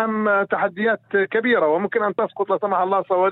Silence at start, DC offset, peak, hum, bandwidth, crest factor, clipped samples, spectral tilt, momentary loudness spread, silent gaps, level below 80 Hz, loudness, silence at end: 0 s; under 0.1%; -6 dBFS; none; 4.2 kHz; 14 dB; under 0.1%; -9 dB/octave; 4 LU; none; -70 dBFS; -20 LUFS; 0 s